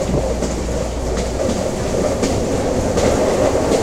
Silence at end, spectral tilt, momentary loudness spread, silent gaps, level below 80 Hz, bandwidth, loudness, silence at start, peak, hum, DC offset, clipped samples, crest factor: 0 s; -5.5 dB/octave; 6 LU; none; -26 dBFS; 16 kHz; -19 LUFS; 0 s; -2 dBFS; none; under 0.1%; under 0.1%; 16 dB